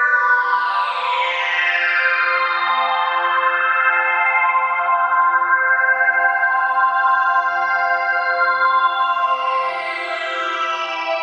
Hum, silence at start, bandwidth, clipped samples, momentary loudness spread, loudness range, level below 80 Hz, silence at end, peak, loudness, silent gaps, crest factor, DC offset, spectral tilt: none; 0 s; 8.4 kHz; under 0.1%; 6 LU; 2 LU; under -90 dBFS; 0 s; -4 dBFS; -16 LUFS; none; 14 dB; under 0.1%; 0 dB/octave